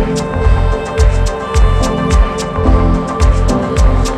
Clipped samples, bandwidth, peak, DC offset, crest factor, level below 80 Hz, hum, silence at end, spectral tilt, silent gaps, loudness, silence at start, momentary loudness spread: under 0.1%; 11 kHz; 0 dBFS; under 0.1%; 10 dB; -12 dBFS; none; 0 s; -6.5 dB/octave; none; -14 LUFS; 0 s; 3 LU